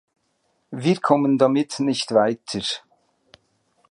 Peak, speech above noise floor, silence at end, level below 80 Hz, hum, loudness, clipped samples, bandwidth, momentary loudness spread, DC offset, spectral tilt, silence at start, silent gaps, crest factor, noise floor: -2 dBFS; 49 dB; 1.15 s; -66 dBFS; none; -21 LUFS; under 0.1%; 11 kHz; 9 LU; under 0.1%; -5.5 dB/octave; 0.7 s; none; 22 dB; -69 dBFS